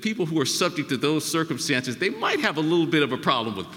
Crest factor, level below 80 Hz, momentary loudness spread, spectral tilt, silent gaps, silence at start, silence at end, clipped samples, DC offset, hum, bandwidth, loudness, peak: 18 dB; -68 dBFS; 3 LU; -4 dB/octave; none; 0 s; 0 s; under 0.1%; under 0.1%; none; 17 kHz; -24 LUFS; -6 dBFS